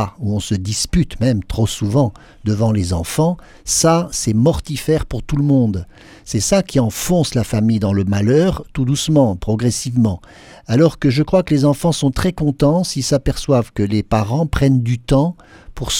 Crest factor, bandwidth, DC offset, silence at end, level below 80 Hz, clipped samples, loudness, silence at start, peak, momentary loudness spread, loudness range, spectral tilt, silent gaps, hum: 16 dB; 17 kHz; under 0.1%; 0 s; -32 dBFS; under 0.1%; -17 LUFS; 0 s; 0 dBFS; 6 LU; 1 LU; -5.5 dB/octave; none; none